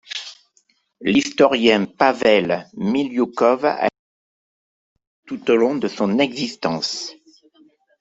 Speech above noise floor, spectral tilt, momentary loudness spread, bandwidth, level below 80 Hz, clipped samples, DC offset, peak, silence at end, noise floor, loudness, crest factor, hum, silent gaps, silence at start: 44 dB; -4.5 dB/octave; 12 LU; 8 kHz; -62 dBFS; under 0.1%; under 0.1%; -2 dBFS; 0.9 s; -63 dBFS; -19 LUFS; 20 dB; none; 3.99-4.96 s, 5.07-5.23 s; 0.1 s